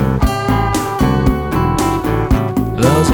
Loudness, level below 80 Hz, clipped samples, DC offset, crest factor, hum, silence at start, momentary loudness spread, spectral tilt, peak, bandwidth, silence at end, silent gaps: -15 LUFS; -22 dBFS; under 0.1%; under 0.1%; 12 dB; none; 0 s; 3 LU; -6.5 dB/octave; 0 dBFS; over 20 kHz; 0 s; none